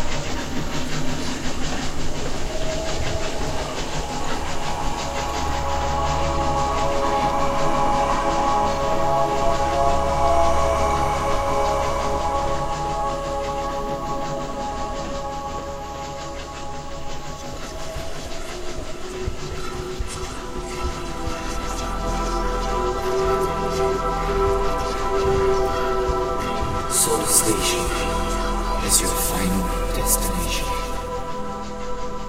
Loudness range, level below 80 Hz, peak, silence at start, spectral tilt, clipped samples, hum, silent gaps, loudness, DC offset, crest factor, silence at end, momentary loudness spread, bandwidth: 11 LU; -30 dBFS; -2 dBFS; 0 s; -3.5 dB/octave; under 0.1%; none; none; -23 LUFS; under 0.1%; 20 dB; 0 s; 11 LU; 16 kHz